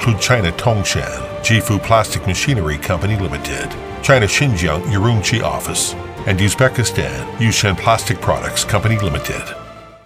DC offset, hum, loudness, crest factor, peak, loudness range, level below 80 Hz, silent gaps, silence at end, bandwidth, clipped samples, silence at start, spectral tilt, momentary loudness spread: under 0.1%; none; -16 LUFS; 16 dB; 0 dBFS; 2 LU; -34 dBFS; none; 0.1 s; 16 kHz; under 0.1%; 0 s; -4.5 dB/octave; 9 LU